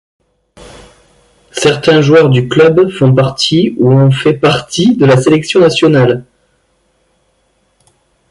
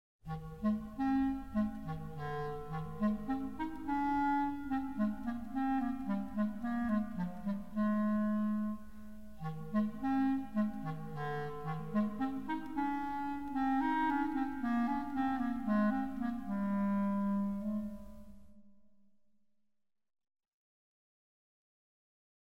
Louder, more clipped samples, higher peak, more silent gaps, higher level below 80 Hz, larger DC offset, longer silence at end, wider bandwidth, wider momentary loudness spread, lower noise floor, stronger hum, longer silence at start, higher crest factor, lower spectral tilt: first, -9 LUFS vs -36 LUFS; neither; first, 0 dBFS vs -22 dBFS; neither; first, -46 dBFS vs -58 dBFS; second, under 0.1% vs 0.4%; first, 2.1 s vs 1.95 s; first, 11.5 kHz vs 7.6 kHz; second, 4 LU vs 10 LU; second, -57 dBFS vs -81 dBFS; neither; first, 1.55 s vs 0.15 s; about the same, 10 dB vs 14 dB; second, -6 dB/octave vs -8.5 dB/octave